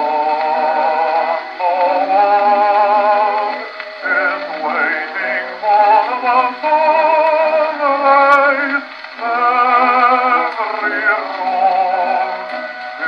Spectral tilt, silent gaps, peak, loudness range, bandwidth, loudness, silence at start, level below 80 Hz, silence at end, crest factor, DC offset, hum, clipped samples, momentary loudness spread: -3.5 dB/octave; none; 0 dBFS; 3 LU; 6.6 kHz; -14 LUFS; 0 s; -72 dBFS; 0 s; 14 dB; under 0.1%; none; under 0.1%; 9 LU